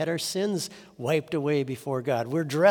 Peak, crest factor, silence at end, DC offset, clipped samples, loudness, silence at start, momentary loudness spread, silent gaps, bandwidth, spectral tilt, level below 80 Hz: -6 dBFS; 20 dB; 0 s; under 0.1%; under 0.1%; -28 LUFS; 0 s; 5 LU; none; over 20 kHz; -5 dB/octave; -72 dBFS